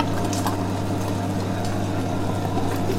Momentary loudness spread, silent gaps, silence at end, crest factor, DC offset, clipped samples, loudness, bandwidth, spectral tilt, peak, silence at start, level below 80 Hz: 2 LU; none; 0 s; 16 dB; under 0.1%; under 0.1%; -25 LUFS; 16.5 kHz; -6 dB/octave; -6 dBFS; 0 s; -40 dBFS